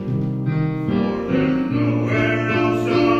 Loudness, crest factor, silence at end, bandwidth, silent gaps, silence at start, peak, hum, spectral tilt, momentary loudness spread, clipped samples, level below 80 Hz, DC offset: -20 LUFS; 14 dB; 0 s; 8 kHz; none; 0 s; -4 dBFS; none; -8 dB/octave; 3 LU; under 0.1%; -44 dBFS; under 0.1%